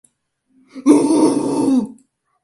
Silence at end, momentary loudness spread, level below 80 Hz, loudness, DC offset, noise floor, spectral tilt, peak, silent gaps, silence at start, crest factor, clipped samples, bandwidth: 0.5 s; 8 LU; -62 dBFS; -15 LUFS; under 0.1%; -65 dBFS; -5.5 dB/octave; 0 dBFS; none; 0.75 s; 18 dB; under 0.1%; 11.5 kHz